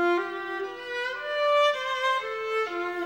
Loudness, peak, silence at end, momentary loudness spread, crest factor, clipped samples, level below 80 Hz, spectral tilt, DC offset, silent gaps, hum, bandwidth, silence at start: -27 LUFS; -14 dBFS; 0 s; 10 LU; 14 dB; under 0.1%; -74 dBFS; -2 dB/octave; under 0.1%; none; none; 16.5 kHz; 0 s